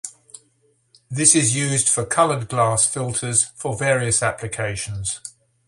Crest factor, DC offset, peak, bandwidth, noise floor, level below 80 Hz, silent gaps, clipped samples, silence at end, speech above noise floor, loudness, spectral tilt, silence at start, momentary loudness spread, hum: 22 dB; under 0.1%; 0 dBFS; 11.5 kHz; -63 dBFS; -50 dBFS; none; under 0.1%; 0.4 s; 43 dB; -19 LUFS; -3 dB/octave; 0.05 s; 12 LU; none